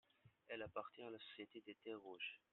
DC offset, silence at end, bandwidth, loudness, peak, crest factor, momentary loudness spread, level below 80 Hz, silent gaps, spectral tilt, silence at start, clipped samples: under 0.1%; 0.15 s; 4.2 kHz; -54 LUFS; -34 dBFS; 22 dB; 6 LU; -88 dBFS; none; -2 dB/octave; 0.25 s; under 0.1%